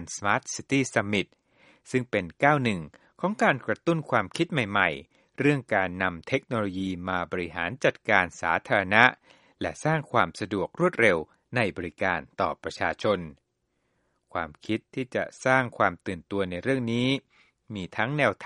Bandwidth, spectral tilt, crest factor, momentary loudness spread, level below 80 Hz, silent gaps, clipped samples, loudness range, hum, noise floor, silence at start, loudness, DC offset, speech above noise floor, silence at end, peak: 11.5 kHz; -5 dB/octave; 26 dB; 10 LU; -60 dBFS; none; under 0.1%; 5 LU; none; -76 dBFS; 0 s; -26 LUFS; under 0.1%; 49 dB; 0 s; 0 dBFS